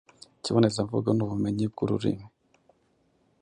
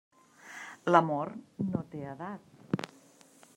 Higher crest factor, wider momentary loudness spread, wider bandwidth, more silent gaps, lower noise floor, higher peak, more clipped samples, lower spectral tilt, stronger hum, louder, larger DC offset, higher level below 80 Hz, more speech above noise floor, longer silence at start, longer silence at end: second, 20 dB vs 26 dB; second, 7 LU vs 20 LU; second, 10.5 kHz vs 15.5 kHz; neither; first, -68 dBFS vs -59 dBFS; about the same, -8 dBFS vs -8 dBFS; neither; about the same, -7 dB/octave vs -7 dB/octave; neither; first, -27 LUFS vs -32 LUFS; neither; first, -58 dBFS vs -74 dBFS; first, 42 dB vs 29 dB; about the same, 0.45 s vs 0.45 s; first, 1.15 s vs 0.7 s